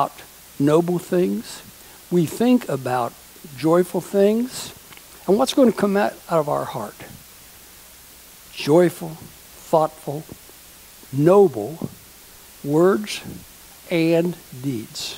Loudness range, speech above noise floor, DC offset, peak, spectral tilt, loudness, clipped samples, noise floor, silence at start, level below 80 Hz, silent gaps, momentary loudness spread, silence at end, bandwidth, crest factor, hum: 3 LU; 25 dB; under 0.1%; -2 dBFS; -6 dB/octave; -20 LUFS; under 0.1%; -45 dBFS; 0 s; -58 dBFS; none; 24 LU; 0 s; 16 kHz; 18 dB; none